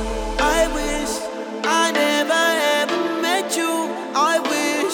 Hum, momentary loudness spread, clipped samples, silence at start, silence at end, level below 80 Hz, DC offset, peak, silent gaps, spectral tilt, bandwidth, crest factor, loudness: none; 7 LU; under 0.1%; 0 s; 0 s; -36 dBFS; under 0.1%; -4 dBFS; none; -2 dB/octave; over 20 kHz; 16 dB; -20 LUFS